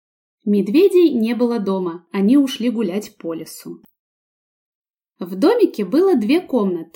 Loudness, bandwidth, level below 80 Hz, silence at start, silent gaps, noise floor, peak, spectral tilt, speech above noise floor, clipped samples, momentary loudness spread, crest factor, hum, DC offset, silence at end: -17 LUFS; 17 kHz; -72 dBFS; 0.45 s; 3.99-4.94 s; under -90 dBFS; -4 dBFS; -6.5 dB/octave; over 73 dB; under 0.1%; 16 LU; 14 dB; none; under 0.1%; 0.1 s